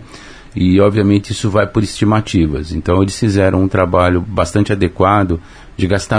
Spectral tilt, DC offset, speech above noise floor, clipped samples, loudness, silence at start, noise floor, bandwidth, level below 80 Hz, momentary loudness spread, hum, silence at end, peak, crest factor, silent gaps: -6.5 dB/octave; under 0.1%; 22 dB; under 0.1%; -14 LUFS; 0 s; -35 dBFS; 10.5 kHz; -32 dBFS; 7 LU; none; 0 s; 0 dBFS; 14 dB; none